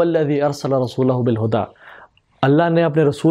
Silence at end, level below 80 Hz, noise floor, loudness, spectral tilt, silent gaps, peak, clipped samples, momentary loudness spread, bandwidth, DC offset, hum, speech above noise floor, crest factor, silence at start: 0 s; -58 dBFS; -46 dBFS; -18 LUFS; -7.5 dB/octave; none; -2 dBFS; under 0.1%; 6 LU; 13 kHz; under 0.1%; none; 30 dB; 16 dB; 0 s